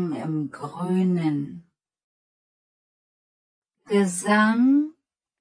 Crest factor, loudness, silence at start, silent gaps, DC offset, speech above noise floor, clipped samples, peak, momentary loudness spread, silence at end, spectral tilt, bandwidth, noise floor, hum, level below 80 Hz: 18 dB; -23 LUFS; 0 s; 2.04-3.62 s; under 0.1%; 39 dB; under 0.1%; -8 dBFS; 13 LU; 0.5 s; -6 dB/octave; 10.5 kHz; -61 dBFS; none; -76 dBFS